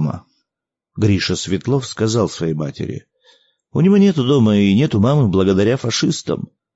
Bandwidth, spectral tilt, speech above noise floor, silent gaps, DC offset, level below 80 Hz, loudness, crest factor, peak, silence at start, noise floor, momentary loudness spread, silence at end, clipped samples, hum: 8 kHz; -6 dB/octave; 69 dB; none; under 0.1%; -50 dBFS; -16 LUFS; 14 dB; -4 dBFS; 0 s; -84 dBFS; 12 LU; 0.3 s; under 0.1%; none